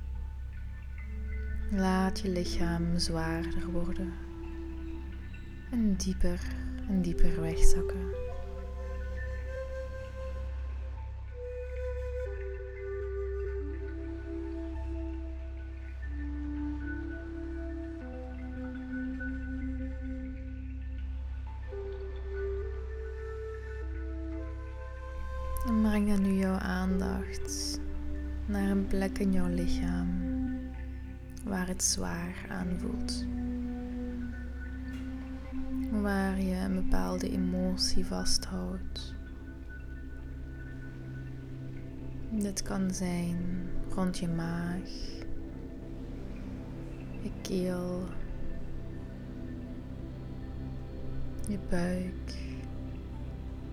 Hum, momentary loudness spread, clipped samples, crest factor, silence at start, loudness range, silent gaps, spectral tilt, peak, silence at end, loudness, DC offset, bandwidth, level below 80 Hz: none; 12 LU; under 0.1%; 24 dB; 0 s; 8 LU; none; -5.5 dB/octave; -8 dBFS; 0 s; -36 LUFS; under 0.1%; 14.5 kHz; -36 dBFS